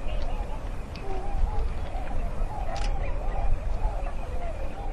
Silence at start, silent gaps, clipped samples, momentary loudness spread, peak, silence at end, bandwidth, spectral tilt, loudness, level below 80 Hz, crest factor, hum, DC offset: 0 s; none; under 0.1%; 5 LU; -12 dBFS; 0 s; 9.2 kHz; -6.5 dB/octave; -34 LUFS; -28 dBFS; 14 dB; none; under 0.1%